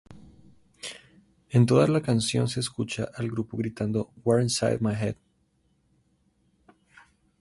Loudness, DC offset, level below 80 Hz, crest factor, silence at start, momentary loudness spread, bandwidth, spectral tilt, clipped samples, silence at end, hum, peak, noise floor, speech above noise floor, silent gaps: -26 LUFS; under 0.1%; -58 dBFS; 20 dB; 0.1 s; 18 LU; 11.5 kHz; -6 dB/octave; under 0.1%; 2.25 s; none; -8 dBFS; -69 dBFS; 44 dB; none